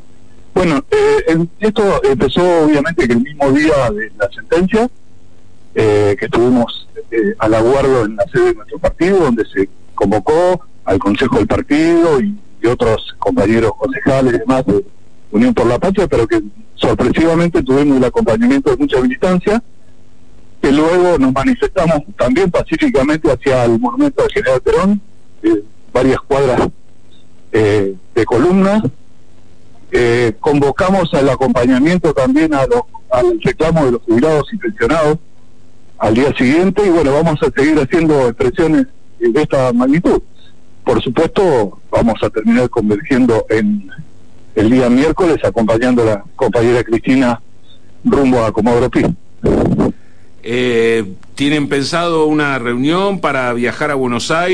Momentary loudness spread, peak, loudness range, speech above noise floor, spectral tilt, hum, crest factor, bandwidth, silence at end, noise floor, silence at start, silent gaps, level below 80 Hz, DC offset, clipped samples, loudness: 7 LU; -2 dBFS; 2 LU; 35 dB; -6.5 dB/octave; none; 12 dB; 11 kHz; 0 s; -47 dBFS; 0.55 s; none; -34 dBFS; 3%; under 0.1%; -13 LUFS